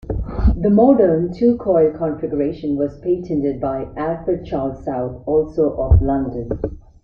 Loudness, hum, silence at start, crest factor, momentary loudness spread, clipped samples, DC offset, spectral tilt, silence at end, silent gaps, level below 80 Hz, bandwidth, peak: -19 LUFS; none; 0.05 s; 16 dB; 10 LU; under 0.1%; under 0.1%; -11.5 dB/octave; 0.25 s; none; -26 dBFS; 5.6 kHz; -2 dBFS